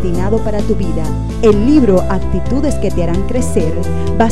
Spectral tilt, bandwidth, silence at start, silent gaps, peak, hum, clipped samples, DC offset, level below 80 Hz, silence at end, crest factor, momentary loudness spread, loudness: -7.5 dB/octave; 13 kHz; 0 s; none; 0 dBFS; none; under 0.1%; 10%; -22 dBFS; 0 s; 14 dB; 8 LU; -15 LUFS